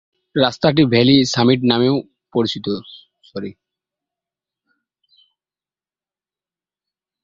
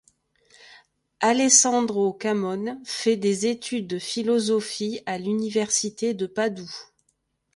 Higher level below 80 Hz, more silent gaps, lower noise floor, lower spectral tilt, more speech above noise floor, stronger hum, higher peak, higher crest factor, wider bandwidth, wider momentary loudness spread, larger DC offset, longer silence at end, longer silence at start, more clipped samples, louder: first, -56 dBFS vs -70 dBFS; neither; first, under -90 dBFS vs -72 dBFS; first, -5.5 dB/octave vs -3 dB/octave; first, over 74 dB vs 48 dB; neither; about the same, 0 dBFS vs -2 dBFS; about the same, 20 dB vs 22 dB; second, 7.6 kHz vs 11.5 kHz; first, 18 LU vs 13 LU; neither; first, 3.7 s vs 0.75 s; second, 0.35 s vs 0.6 s; neither; first, -16 LUFS vs -23 LUFS